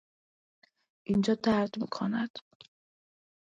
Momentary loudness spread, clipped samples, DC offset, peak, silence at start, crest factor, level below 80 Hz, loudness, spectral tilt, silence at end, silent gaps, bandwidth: 15 LU; under 0.1%; under 0.1%; -16 dBFS; 1.1 s; 18 dB; -66 dBFS; -30 LUFS; -6.5 dB/octave; 1.2 s; 2.30-2.34 s; 7.8 kHz